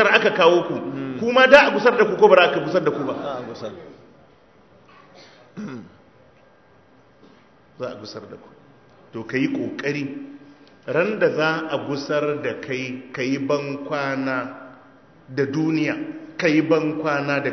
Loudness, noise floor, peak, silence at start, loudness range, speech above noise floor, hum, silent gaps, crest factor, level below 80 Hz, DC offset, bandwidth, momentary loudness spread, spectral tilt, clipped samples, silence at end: -20 LUFS; -54 dBFS; 0 dBFS; 0 s; 23 LU; 34 dB; none; none; 22 dB; -64 dBFS; under 0.1%; 8 kHz; 21 LU; -5.5 dB/octave; under 0.1%; 0 s